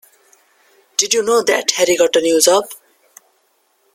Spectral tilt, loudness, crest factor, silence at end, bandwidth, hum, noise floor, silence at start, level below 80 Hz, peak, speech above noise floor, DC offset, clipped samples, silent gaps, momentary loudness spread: -1 dB/octave; -14 LUFS; 18 dB; 1.2 s; 16.5 kHz; none; -61 dBFS; 1 s; -62 dBFS; 0 dBFS; 47 dB; under 0.1%; under 0.1%; none; 6 LU